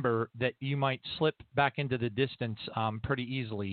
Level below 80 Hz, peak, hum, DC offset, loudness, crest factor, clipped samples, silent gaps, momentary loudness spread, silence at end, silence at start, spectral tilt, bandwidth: -60 dBFS; -12 dBFS; none; under 0.1%; -32 LUFS; 20 dB; under 0.1%; none; 5 LU; 0 s; 0 s; -4.5 dB/octave; 4.7 kHz